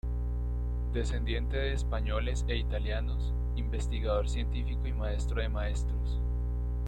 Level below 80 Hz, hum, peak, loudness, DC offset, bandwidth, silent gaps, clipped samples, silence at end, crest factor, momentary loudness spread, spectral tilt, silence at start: -32 dBFS; 60 Hz at -30 dBFS; -18 dBFS; -33 LUFS; under 0.1%; 9 kHz; none; under 0.1%; 0 s; 12 dB; 3 LU; -6.5 dB/octave; 0.05 s